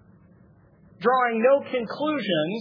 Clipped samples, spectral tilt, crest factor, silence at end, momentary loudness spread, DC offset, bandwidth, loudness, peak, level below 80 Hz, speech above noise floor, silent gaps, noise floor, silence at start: under 0.1%; -7.5 dB/octave; 18 dB; 0 s; 7 LU; under 0.1%; 5.4 kHz; -23 LUFS; -8 dBFS; -68 dBFS; 32 dB; none; -55 dBFS; 1 s